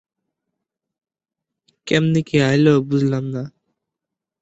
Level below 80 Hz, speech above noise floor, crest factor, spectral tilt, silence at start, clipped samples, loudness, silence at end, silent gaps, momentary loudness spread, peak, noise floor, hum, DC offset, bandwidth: -58 dBFS; 68 dB; 18 dB; -7 dB/octave; 1.85 s; under 0.1%; -18 LUFS; 0.9 s; none; 16 LU; -2 dBFS; -84 dBFS; none; under 0.1%; 8.2 kHz